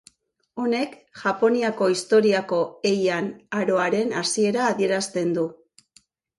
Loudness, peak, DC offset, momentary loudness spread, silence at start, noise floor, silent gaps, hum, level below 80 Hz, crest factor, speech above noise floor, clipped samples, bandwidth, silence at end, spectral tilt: -23 LUFS; -8 dBFS; under 0.1%; 9 LU; 0.55 s; -60 dBFS; none; none; -70 dBFS; 16 dB; 38 dB; under 0.1%; 11.5 kHz; 0.85 s; -4.5 dB/octave